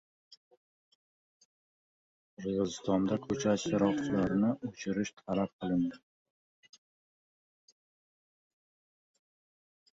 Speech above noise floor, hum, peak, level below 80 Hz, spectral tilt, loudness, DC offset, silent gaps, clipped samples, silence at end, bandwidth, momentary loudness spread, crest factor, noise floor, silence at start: over 58 dB; none; -16 dBFS; -66 dBFS; -6 dB/octave; -33 LUFS; under 0.1%; 5.53-5.59 s; under 0.1%; 4 s; 7.8 kHz; 7 LU; 20 dB; under -90 dBFS; 2.4 s